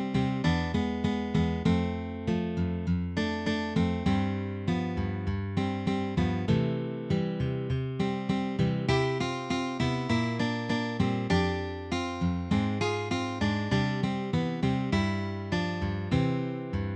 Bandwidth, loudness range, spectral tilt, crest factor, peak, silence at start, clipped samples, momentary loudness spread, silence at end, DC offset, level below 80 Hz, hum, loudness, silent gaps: 9.6 kHz; 1 LU; -7 dB/octave; 16 dB; -12 dBFS; 0 s; under 0.1%; 5 LU; 0 s; under 0.1%; -46 dBFS; none; -29 LUFS; none